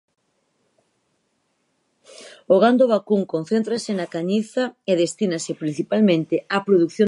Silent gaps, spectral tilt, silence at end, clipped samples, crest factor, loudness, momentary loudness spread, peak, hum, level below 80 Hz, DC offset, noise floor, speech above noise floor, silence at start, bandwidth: none; -6 dB/octave; 0 s; under 0.1%; 18 dB; -21 LUFS; 10 LU; -4 dBFS; none; -74 dBFS; under 0.1%; -70 dBFS; 50 dB; 2.2 s; 11.5 kHz